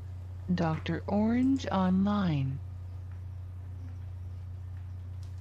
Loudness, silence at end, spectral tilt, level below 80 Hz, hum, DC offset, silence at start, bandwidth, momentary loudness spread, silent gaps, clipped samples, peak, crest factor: -32 LUFS; 0 s; -8 dB/octave; -52 dBFS; none; under 0.1%; 0 s; 8 kHz; 15 LU; none; under 0.1%; -18 dBFS; 14 dB